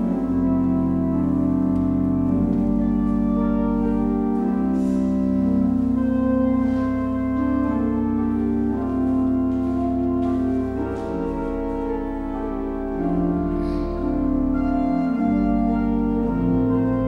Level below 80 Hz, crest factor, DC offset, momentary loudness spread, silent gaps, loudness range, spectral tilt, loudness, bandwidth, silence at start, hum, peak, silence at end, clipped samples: -34 dBFS; 12 dB; under 0.1%; 6 LU; none; 4 LU; -10 dB/octave; -22 LUFS; 5 kHz; 0 s; none; -10 dBFS; 0 s; under 0.1%